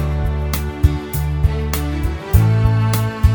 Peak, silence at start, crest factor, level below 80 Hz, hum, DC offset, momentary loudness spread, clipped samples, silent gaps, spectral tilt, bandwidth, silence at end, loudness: 0 dBFS; 0 s; 16 dB; -20 dBFS; none; under 0.1%; 7 LU; under 0.1%; none; -6.5 dB/octave; over 20 kHz; 0 s; -18 LUFS